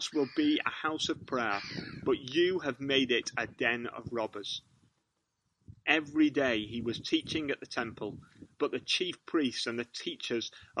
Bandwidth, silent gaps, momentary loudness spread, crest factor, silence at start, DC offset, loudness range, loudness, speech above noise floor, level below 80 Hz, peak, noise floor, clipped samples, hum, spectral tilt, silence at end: 11 kHz; none; 10 LU; 22 dB; 0 s; under 0.1%; 3 LU; -32 LUFS; 48 dB; -66 dBFS; -10 dBFS; -81 dBFS; under 0.1%; none; -4 dB/octave; 0 s